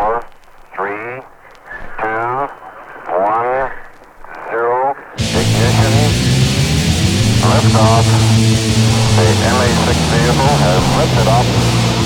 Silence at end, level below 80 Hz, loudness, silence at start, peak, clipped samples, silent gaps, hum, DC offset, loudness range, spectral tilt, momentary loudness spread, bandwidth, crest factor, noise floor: 0 s; -28 dBFS; -13 LUFS; 0 s; 0 dBFS; under 0.1%; none; none; under 0.1%; 9 LU; -5 dB/octave; 16 LU; 17 kHz; 14 dB; -38 dBFS